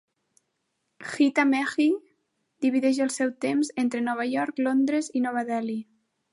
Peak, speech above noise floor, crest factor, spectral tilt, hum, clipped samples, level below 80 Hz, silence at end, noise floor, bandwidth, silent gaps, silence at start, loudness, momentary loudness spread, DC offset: -10 dBFS; 53 dB; 16 dB; -4 dB/octave; none; under 0.1%; -80 dBFS; 0.5 s; -77 dBFS; 11.5 kHz; none; 1 s; -25 LUFS; 8 LU; under 0.1%